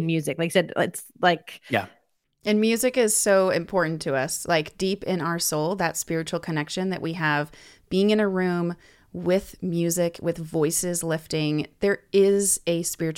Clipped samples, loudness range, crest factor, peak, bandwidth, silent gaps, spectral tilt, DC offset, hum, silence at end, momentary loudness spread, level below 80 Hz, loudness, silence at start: under 0.1%; 3 LU; 16 dB; -8 dBFS; 17 kHz; none; -4 dB/octave; under 0.1%; none; 0 s; 8 LU; -58 dBFS; -24 LUFS; 0 s